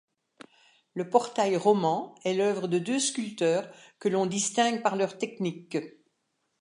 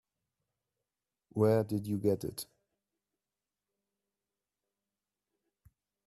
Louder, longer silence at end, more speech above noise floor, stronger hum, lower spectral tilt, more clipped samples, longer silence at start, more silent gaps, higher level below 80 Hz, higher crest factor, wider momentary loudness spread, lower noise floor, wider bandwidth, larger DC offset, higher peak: first, -28 LUFS vs -32 LUFS; second, 0.7 s vs 3.65 s; second, 50 dB vs over 59 dB; second, none vs 50 Hz at -60 dBFS; second, -4 dB/octave vs -7 dB/octave; neither; second, 0.95 s vs 1.35 s; neither; second, -80 dBFS vs -72 dBFS; about the same, 22 dB vs 22 dB; second, 10 LU vs 15 LU; second, -77 dBFS vs under -90 dBFS; second, 11.5 kHz vs 13.5 kHz; neither; first, -8 dBFS vs -16 dBFS